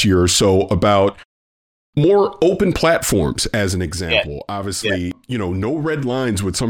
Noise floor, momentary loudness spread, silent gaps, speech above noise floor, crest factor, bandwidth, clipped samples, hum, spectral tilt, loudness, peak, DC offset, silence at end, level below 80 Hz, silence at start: under -90 dBFS; 9 LU; 1.25-1.93 s; over 73 dB; 16 dB; 17.5 kHz; under 0.1%; none; -4.5 dB/octave; -17 LUFS; -2 dBFS; under 0.1%; 0 s; -38 dBFS; 0 s